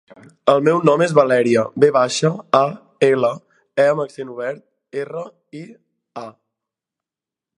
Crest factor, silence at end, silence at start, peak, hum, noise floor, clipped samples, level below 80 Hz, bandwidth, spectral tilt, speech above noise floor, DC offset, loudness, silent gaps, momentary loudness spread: 18 dB; 1.3 s; 0.45 s; 0 dBFS; none; -89 dBFS; under 0.1%; -68 dBFS; 11 kHz; -5.5 dB/octave; 72 dB; under 0.1%; -17 LUFS; none; 20 LU